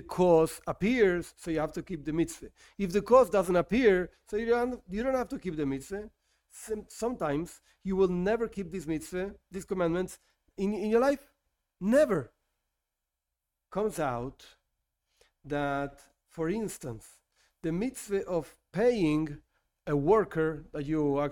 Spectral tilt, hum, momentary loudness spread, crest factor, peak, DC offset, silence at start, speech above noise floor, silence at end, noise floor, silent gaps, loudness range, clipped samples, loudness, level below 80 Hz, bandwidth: -6.5 dB/octave; none; 16 LU; 22 dB; -10 dBFS; under 0.1%; 0 s; 58 dB; 0 s; -87 dBFS; none; 9 LU; under 0.1%; -30 LUFS; -54 dBFS; 17 kHz